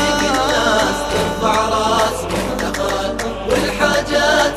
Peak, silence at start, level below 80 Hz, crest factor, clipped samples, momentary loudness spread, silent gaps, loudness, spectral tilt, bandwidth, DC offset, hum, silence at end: 0 dBFS; 0 s; -34 dBFS; 16 dB; under 0.1%; 6 LU; none; -17 LUFS; -3.5 dB/octave; 14 kHz; under 0.1%; none; 0 s